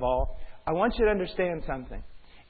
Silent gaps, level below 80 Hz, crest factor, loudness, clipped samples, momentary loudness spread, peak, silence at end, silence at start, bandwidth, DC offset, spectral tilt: none; -38 dBFS; 16 dB; -29 LUFS; under 0.1%; 14 LU; -12 dBFS; 0.1 s; 0 s; 4.8 kHz; under 0.1%; -10.5 dB/octave